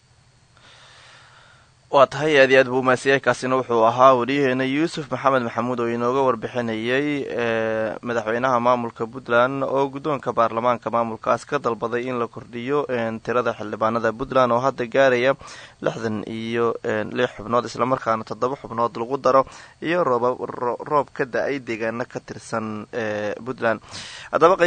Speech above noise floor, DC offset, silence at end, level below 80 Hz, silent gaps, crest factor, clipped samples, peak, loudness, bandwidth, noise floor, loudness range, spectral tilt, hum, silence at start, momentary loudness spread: 35 dB; under 0.1%; 0 s; -58 dBFS; none; 20 dB; under 0.1%; 0 dBFS; -22 LUFS; 9.6 kHz; -56 dBFS; 6 LU; -5.5 dB/octave; none; 1.9 s; 11 LU